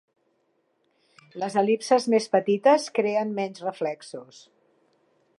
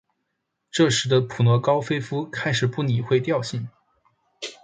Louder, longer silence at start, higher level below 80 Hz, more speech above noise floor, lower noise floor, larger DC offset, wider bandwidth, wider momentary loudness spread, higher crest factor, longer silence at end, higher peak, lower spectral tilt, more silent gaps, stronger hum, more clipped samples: about the same, -24 LUFS vs -22 LUFS; first, 1.35 s vs 0.75 s; second, -84 dBFS vs -60 dBFS; second, 47 dB vs 56 dB; second, -71 dBFS vs -78 dBFS; neither; first, 11.5 kHz vs 9.4 kHz; first, 17 LU vs 13 LU; about the same, 20 dB vs 18 dB; first, 1.15 s vs 0.1 s; about the same, -6 dBFS vs -6 dBFS; about the same, -5 dB/octave vs -5.5 dB/octave; neither; neither; neither